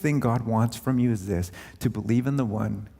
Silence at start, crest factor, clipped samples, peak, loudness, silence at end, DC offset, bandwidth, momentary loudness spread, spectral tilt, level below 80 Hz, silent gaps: 0 s; 16 dB; under 0.1%; -10 dBFS; -26 LUFS; 0.1 s; under 0.1%; 16 kHz; 6 LU; -7.5 dB/octave; -52 dBFS; none